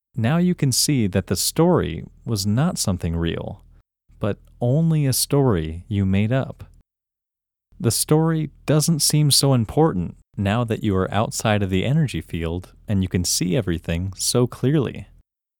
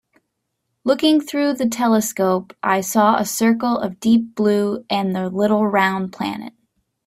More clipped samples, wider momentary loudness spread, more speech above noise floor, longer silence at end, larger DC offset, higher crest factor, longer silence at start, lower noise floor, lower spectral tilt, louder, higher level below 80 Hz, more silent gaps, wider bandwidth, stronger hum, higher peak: neither; about the same, 10 LU vs 8 LU; first, 66 dB vs 57 dB; about the same, 0.55 s vs 0.55 s; neither; about the same, 18 dB vs 18 dB; second, 0.15 s vs 0.85 s; first, -87 dBFS vs -75 dBFS; about the same, -5 dB/octave vs -4.5 dB/octave; about the same, -21 LUFS vs -19 LUFS; first, -44 dBFS vs -62 dBFS; neither; first, 19.5 kHz vs 16 kHz; neither; about the same, -4 dBFS vs -2 dBFS